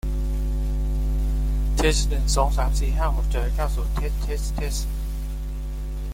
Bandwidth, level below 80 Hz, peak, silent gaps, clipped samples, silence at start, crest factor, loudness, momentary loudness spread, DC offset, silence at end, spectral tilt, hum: 16 kHz; -22 dBFS; -6 dBFS; none; under 0.1%; 0.05 s; 16 dB; -26 LUFS; 10 LU; under 0.1%; 0 s; -5 dB/octave; none